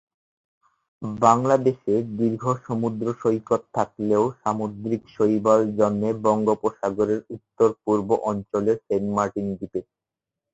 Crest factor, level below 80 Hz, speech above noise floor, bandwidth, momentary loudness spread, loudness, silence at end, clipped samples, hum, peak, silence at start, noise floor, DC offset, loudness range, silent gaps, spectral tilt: 22 dB; -60 dBFS; 65 dB; 8 kHz; 10 LU; -23 LUFS; 0.7 s; under 0.1%; none; -2 dBFS; 1 s; -87 dBFS; under 0.1%; 2 LU; none; -7.5 dB/octave